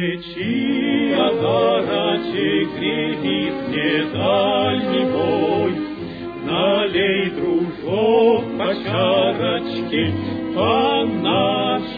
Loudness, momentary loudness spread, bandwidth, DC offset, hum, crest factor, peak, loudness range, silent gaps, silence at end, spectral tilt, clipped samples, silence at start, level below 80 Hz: -19 LUFS; 6 LU; 5 kHz; under 0.1%; none; 16 dB; -4 dBFS; 1 LU; none; 0 s; -8.5 dB/octave; under 0.1%; 0 s; -52 dBFS